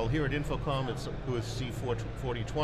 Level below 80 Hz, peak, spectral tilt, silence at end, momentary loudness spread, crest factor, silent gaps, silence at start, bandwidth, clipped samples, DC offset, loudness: -42 dBFS; -18 dBFS; -6.5 dB/octave; 0 s; 5 LU; 14 dB; none; 0 s; 13.5 kHz; under 0.1%; under 0.1%; -34 LUFS